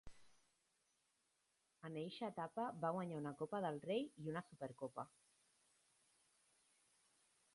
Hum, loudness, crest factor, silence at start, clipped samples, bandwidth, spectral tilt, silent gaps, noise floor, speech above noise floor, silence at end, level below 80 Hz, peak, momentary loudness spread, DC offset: none; -47 LUFS; 22 dB; 0.05 s; under 0.1%; 11.5 kHz; -6.5 dB/octave; none; -84 dBFS; 38 dB; 2.45 s; -80 dBFS; -28 dBFS; 10 LU; under 0.1%